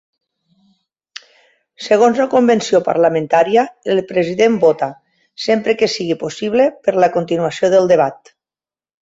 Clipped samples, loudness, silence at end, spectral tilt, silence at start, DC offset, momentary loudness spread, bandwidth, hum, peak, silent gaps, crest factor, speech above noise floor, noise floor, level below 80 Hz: under 0.1%; -15 LUFS; 0.85 s; -5 dB/octave; 1.8 s; under 0.1%; 10 LU; 8 kHz; none; -2 dBFS; none; 14 dB; over 76 dB; under -90 dBFS; -60 dBFS